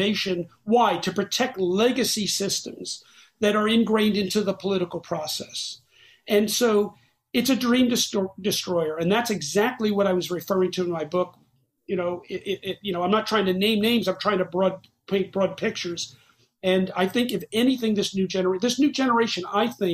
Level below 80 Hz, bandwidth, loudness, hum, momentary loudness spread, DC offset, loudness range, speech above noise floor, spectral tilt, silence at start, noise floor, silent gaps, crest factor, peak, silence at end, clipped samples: -62 dBFS; 15.5 kHz; -24 LUFS; none; 9 LU; under 0.1%; 3 LU; 25 dB; -4 dB/octave; 0 s; -48 dBFS; none; 16 dB; -8 dBFS; 0 s; under 0.1%